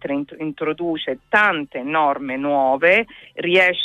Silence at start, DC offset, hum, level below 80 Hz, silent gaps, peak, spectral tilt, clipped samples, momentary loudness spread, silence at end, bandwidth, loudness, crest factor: 0.05 s; under 0.1%; none; -60 dBFS; none; -4 dBFS; -5.5 dB/octave; under 0.1%; 11 LU; 0 s; 12 kHz; -19 LUFS; 16 dB